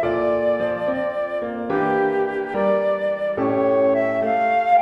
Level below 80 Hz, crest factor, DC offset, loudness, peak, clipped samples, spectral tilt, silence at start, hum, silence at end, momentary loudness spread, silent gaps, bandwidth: -56 dBFS; 14 dB; under 0.1%; -21 LUFS; -6 dBFS; under 0.1%; -8 dB/octave; 0 s; none; 0 s; 6 LU; none; 5.6 kHz